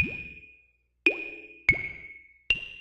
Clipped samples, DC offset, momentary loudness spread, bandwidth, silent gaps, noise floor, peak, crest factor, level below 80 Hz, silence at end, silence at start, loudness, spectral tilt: under 0.1%; under 0.1%; 21 LU; 12.5 kHz; none; -66 dBFS; -8 dBFS; 22 dB; -52 dBFS; 0 s; 0 s; -28 LUFS; -4.5 dB/octave